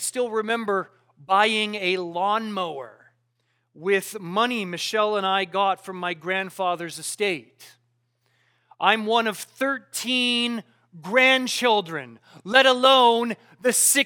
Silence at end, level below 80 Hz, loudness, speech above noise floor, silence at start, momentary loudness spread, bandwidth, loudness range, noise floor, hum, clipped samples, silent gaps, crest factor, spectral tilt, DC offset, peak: 0 s; -82 dBFS; -22 LUFS; 49 dB; 0 s; 13 LU; 19 kHz; 7 LU; -72 dBFS; none; under 0.1%; none; 22 dB; -2 dB/octave; under 0.1%; -2 dBFS